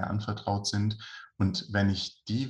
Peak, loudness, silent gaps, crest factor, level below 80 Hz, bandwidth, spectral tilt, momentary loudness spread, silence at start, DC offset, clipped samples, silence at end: -14 dBFS; -30 LUFS; none; 16 dB; -60 dBFS; 10.5 kHz; -5.5 dB/octave; 5 LU; 0 s; under 0.1%; under 0.1%; 0 s